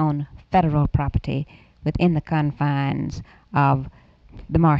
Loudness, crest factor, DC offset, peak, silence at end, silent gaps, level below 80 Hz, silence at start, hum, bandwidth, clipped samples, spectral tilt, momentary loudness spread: -22 LUFS; 16 dB; under 0.1%; -6 dBFS; 0 s; none; -36 dBFS; 0 s; none; 6.6 kHz; under 0.1%; -9 dB/octave; 10 LU